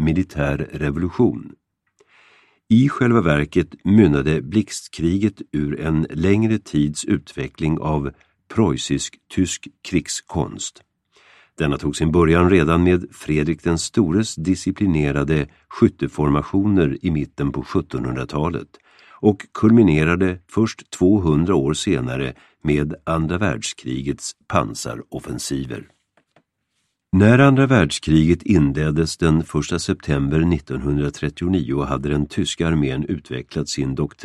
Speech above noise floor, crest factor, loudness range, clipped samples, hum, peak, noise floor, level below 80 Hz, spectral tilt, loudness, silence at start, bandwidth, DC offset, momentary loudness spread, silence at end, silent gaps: 54 dB; 18 dB; 6 LU; under 0.1%; none; 0 dBFS; -72 dBFS; -38 dBFS; -6 dB/octave; -20 LUFS; 0 s; 12.5 kHz; under 0.1%; 11 LU; 0 s; none